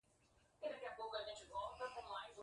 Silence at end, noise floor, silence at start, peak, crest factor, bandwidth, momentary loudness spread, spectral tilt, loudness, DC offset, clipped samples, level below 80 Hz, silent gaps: 0 s; -75 dBFS; 0.4 s; -32 dBFS; 18 dB; 11 kHz; 3 LU; -2.5 dB/octave; -49 LUFS; under 0.1%; under 0.1%; -74 dBFS; none